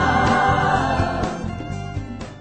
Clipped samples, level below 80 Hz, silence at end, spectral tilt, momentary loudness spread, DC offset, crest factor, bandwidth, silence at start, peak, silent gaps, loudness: under 0.1%; -36 dBFS; 0 s; -6 dB/octave; 13 LU; under 0.1%; 16 dB; 9.2 kHz; 0 s; -6 dBFS; none; -21 LUFS